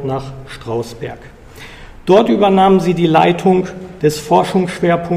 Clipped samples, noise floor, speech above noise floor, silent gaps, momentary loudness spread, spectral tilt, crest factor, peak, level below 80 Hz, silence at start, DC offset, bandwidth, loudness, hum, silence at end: under 0.1%; -35 dBFS; 21 dB; none; 19 LU; -6.5 dB/octave; 14 dB; 0 dBFS; -42 dBFS; 0 s; under 0.1%; 15 kHz; -13 LUFS; none; 0 s